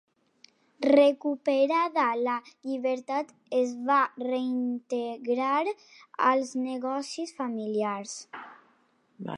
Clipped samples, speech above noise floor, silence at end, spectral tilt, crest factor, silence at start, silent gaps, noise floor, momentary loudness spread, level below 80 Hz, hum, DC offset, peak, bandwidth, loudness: under 0.1%; 39 dB; 0 s; -4.5 dB/octave; 20 dB; 0.8 s; none; -67 dBFS; 12 LU; -86 dBFS; none; under 0.1%; -8 dBFS; 11 kHz; -28 LUFS